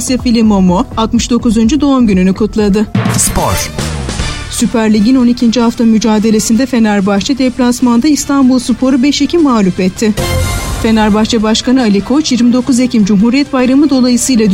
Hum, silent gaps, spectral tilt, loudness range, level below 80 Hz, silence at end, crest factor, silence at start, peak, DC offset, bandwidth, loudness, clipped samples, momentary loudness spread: none; none; -5 dB/octave; 2 LU; -26 dBFS; 0 s; 10 dB; 0 s; 0 dBFS; under 0.1%; 16.5 kHz; -10 LUFS; under 0.1%; 5 LU